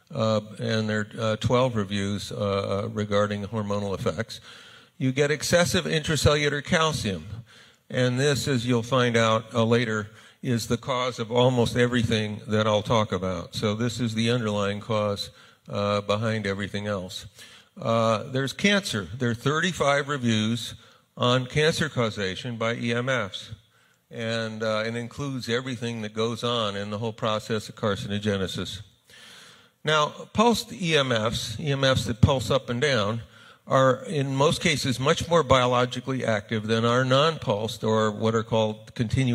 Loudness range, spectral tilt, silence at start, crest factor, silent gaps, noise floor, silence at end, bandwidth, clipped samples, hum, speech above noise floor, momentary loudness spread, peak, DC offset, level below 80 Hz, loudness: 5 LU; -5 dB/octave; 0.1 s; 22 dB; none; -62 dBFS; 0 s; 15.5 kHz; under 0.1%; none; 37 dB; 10 LU; -4 dBFS; under 0.1%; -50 dBFS; -25 LUFS